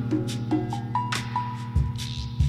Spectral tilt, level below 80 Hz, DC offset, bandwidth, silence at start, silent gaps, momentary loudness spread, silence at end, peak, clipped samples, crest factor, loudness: -6 dB/octave; -34 dBFS; under 0.1%; 14 kHz; 0 s; none; 3 LU; 0 s; -12 dBFS; under 0.1%; 14 dB; -28 LUFS